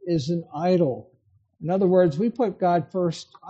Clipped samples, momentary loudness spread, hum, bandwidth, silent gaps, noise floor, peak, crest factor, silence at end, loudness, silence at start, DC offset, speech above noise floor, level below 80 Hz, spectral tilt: under 0.1%; 9 LU; none; 8.2 kHz; none; -57 dBFS; -8 dBFS; 14 dB; 0 s; -23 LUFS; 0.05 s; under 0.1%; 34 dB; -62 dBFS; -8 dB/octave